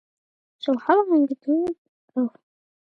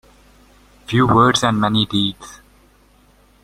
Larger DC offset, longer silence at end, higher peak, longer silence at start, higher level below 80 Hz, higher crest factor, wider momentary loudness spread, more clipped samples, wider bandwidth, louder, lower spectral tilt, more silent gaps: neither; second, 0.7 s vs 1.1 s; about the same, -4 dBFS vs -2 dBFS; second, 0.65 s vs 0.9 s; second, -72 dBFS vs -46 dBFS; about the same, 20 dB vs 18 dB; second, 13 LU vs 16 LU; neither; second, 5.8 kHz vs 15 kHz; second, -23 LUFS vs -16 LUFS; first, -6.5 dB/octave vs -5 dB/octave; first, 1.78-2.08 s vs none